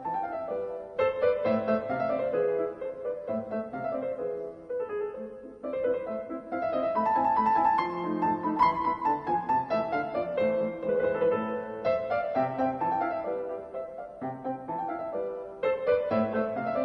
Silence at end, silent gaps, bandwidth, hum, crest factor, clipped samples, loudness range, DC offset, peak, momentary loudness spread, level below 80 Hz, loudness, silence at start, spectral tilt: 0 s; none; 5.8 kHz; none; 18 dB; under 0.1%; 6 LU; under 0.1%; -10 dBFS; 11 LU; -62 dBFS; -29 LUFS; 0 s; -8 dB/octave